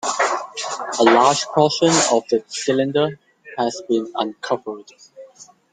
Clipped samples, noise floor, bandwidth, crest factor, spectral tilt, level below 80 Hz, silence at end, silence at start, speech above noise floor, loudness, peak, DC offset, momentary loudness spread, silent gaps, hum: under 0.1%; -46 dBFS; 9.6 kHz; 18 dB; -3.5 dB/octave; -64 dBFS; 0.3 s; 0.05 s; 27 dB; -19 LUFS; -2 dBFS; under 0.1%; 11 LU; none; none